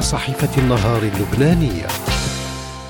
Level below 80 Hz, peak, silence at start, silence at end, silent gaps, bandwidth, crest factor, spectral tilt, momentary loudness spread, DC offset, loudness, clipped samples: -30 dBFS; -4 dBFS; 0 s; 0 s; none; 17.5 kHz; 14 dB; -5.5 dB/octave; 7 LU; under 0.1%; -18 LUFS; under 0.1%